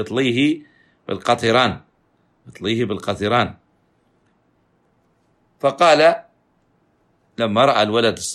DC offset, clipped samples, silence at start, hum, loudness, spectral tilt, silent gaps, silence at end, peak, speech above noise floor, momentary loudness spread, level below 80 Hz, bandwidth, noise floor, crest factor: under 0.1%; under 0.1%; 0 s; none; -18 LUFS; -4.5 dB/octave; none; 0 s; -2 dBFS; 45 dB; 14 LU; -58 dBFS; 13 kHz; -62 dBFS; 18 dB